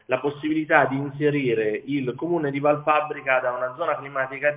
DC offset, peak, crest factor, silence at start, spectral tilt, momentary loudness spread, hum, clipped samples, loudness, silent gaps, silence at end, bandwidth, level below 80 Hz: under 0.1%; -2 dBFS; 22 dB; 0.1 s; -10 dB/octave; 7 LU; none; under 0.1%; -23 LUFS; none; 0 s; 4 kHz; -66 dBFS